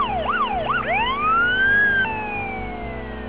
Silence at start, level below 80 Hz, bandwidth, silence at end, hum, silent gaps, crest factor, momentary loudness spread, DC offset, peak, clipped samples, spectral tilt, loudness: 0 s; -40 dBFS; 4 kHz; 0 s; none; none; 12 dB; 14 LU; 0.8%; -10 dBFS; under 0.1%; -8 dB/octave; -20 LUFS